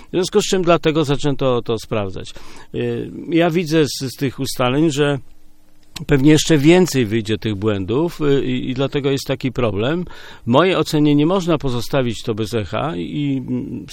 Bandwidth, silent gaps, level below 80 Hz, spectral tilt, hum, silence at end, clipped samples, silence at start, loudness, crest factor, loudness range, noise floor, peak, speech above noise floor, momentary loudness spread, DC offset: 17 kHz; none; -36 dBFS; -5.5 dB/octave; none; 0 s; under 0.1%; 0 s; -18 LUFS; 18 dB; 4 LU; -41 dBFS; 0 dBFS; 24 dB; 11 LU; under 0.1%